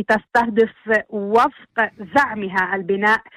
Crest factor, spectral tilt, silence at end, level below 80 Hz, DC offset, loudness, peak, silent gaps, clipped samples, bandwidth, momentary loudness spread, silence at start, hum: 14 dB; -5.5 dB/octave; 0.15 s; -56 dBFS; under 0.1%; -19 LUFS; -4 dBFS; none; under 0.1%; 14 kHz; 4 LU; 0 s; none